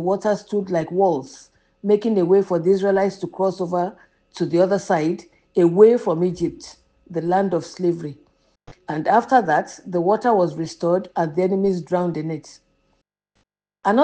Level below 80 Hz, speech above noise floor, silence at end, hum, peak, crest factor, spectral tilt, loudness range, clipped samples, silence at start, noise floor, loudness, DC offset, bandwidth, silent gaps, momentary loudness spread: -60 dBFS; 50 dB; 0 s; none; -2 dBFS; 20 dB; -7 dB/octave; 4 LU; under 0.1%; 0 s; -69 dBFS; -20 LUFS; under 0.1%; 9 kHz; none; 12 LU